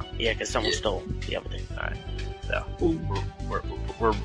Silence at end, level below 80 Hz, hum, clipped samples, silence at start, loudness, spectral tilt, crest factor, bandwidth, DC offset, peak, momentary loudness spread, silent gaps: 0 s; -36 dBFS; none; under 0.1%; 0 s; -30 LUFS; -4.5 dB/octave; 18 dB; 10.5 kHz; under 0.1%; -10 dBFS; 9 LU; none